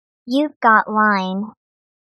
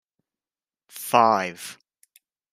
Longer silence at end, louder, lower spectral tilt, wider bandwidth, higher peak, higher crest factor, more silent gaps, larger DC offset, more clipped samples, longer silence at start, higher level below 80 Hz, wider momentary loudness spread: second, 0.65 s vs 0.8 s; first, -17 LUFS vs -21 LUFS; first, -6.5 dB/octave vs -3.5 dB/octave; second, 12 kHz vs 16 kHz; about the same, -2 dBFS vs -4 dBFS; about the same, 18 dB vs 22 dB; first, 0.56-0.61 s vs none; neither; neither; second, 0.25 s vs 0.95 s; first, -72 dBFS vs -80 dBFS; second, 13 LU vs 20 LU